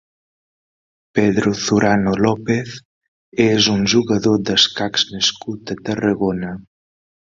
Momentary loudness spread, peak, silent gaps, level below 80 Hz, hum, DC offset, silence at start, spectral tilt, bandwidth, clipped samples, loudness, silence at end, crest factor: 14 LU; 0 dBFS; 2.85-3.01 s, 3.08-3.32 s; -48 dBFS; none; under 0.1%; 1.15 s; -4.5 dB/octave; 7.6 kHz; under 0.1%; -17 LUFS; 0.7 s; 18 dB